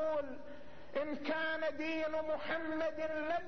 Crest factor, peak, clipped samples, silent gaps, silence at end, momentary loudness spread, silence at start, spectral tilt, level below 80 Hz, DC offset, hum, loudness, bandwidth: 14 dB; -24 dBFS; under 0.1%; none; 0 s; 10 LU; 0 s; -2 dB/octave; -68 dBFS; 0.5%; none; -38 LUFS; 6.4 kHz